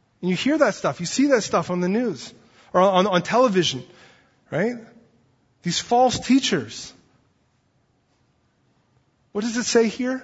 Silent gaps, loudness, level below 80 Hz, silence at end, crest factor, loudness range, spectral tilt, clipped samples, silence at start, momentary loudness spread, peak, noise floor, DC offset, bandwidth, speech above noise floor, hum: none; -21 LUFS; -60 dBFS; 0 s; 20 dB; 7 LU; -4.5 dB/octave; under 0.1%; 0.2 s; 15 LU; -4 dBFS; -65 dBFS; under 0.1%; 8 kHz; 44 dB; none